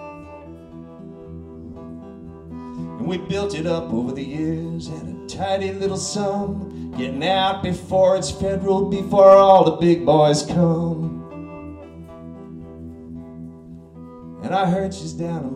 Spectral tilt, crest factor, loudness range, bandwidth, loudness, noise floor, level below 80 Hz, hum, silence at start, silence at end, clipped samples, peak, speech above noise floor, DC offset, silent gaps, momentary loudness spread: -6 dB/octave; 20 dB; 16 LU; 11 kHz; -19 LUFS; -40 dBFS; -48 dBFS; none; 0 s; 0 s; under 0.1%; -2 dBFS; 22 dB; under 0.1%; none; 23 LU